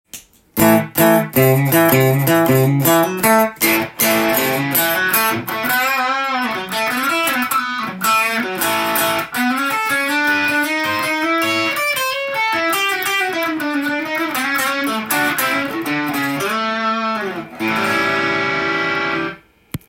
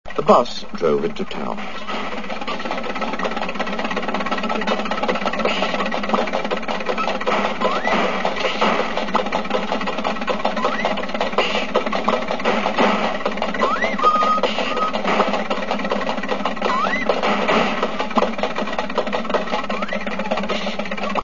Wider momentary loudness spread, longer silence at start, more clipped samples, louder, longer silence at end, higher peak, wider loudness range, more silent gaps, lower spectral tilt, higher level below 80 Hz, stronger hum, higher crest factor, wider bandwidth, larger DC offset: about the same, 6 LU vs 7 LU; about the same, 0.15 s vs 0.05 s; neither; first, -16 LUFS vs -21 LUFS; about the same, 0.1 s vs 0 s; about the same, 0 dBFS vs 0 dBFS; about the same, 5 LU vs 4 LU; neither; about the same, -4 dB/octave vs -4.5 dB/octave; second, -54 dBFS vs -48 dBFS; neither; about the same, 18 dB vs 20 dB; first, 17 kHz vs 7.4 kHz; second, under 0.1% vs 5%